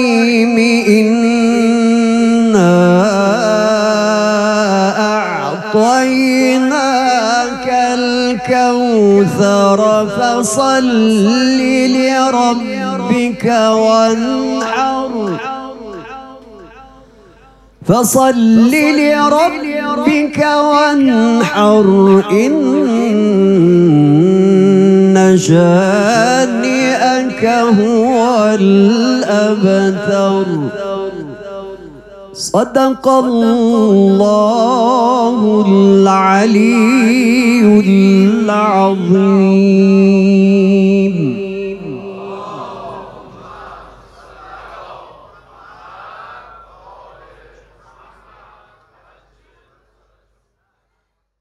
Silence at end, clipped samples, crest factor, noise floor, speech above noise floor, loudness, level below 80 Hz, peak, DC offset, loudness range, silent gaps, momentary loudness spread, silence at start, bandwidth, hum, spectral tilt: 5 s; under 0.1%; 12 dB; -69 dBFS; 59 dB; -11 LUFS; -50 dBFS; 0 dBFS; under 0.1%; 7 LU; none; 11 LU; 0 s; 13.5 kHz; none; -6 dB/octave